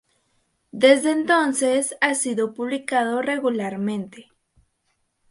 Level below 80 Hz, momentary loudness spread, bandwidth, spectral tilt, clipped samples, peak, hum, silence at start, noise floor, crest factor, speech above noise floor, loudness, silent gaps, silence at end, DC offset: -70 dBFS; 11 LU; 11.5 kHz; -3.5 dB/octave; under 0.1%; -2 dBFS; none; 0.75 s; -71 dBFS; 20 dB; 50 dB; -21 LUFS; none; 1.1 s; under 0.1%